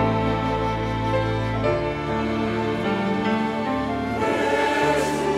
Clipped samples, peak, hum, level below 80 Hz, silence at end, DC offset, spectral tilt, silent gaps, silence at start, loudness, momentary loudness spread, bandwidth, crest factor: under 0.1%; -8 dBFS; none; -40 dBFS; 0 s; under 0.1%; -6 dB/octave; none; 0 s; -23 LUFS; 4 LU; 15 kHz; 14 dB